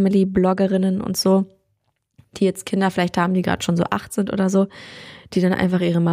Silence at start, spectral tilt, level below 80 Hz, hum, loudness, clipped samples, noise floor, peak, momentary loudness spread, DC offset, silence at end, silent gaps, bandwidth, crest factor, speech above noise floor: 0 s; -6 dB/octave; -50 dBFS; none; -20 LUFS; under 0.1%; -70 dBFS; -4 dBFS; 8 LU; under 0.1%; 0 s; none; 15.5 kHz; 16 dB; 51 dB